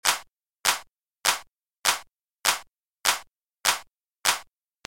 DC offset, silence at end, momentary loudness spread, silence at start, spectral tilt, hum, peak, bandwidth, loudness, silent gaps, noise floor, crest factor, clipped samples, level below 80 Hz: under 0.1%; 0.45 s; 6 LU; 0.05 s; 2 dB/octave; none; -2 dBFS; 17 kHz; -26 LUFS; 1.63-1.67 s, 1.78-1.82 s, 3.28-3.32 s; -46 dBFS; 26 dB; under 0.1%; -64 dBFS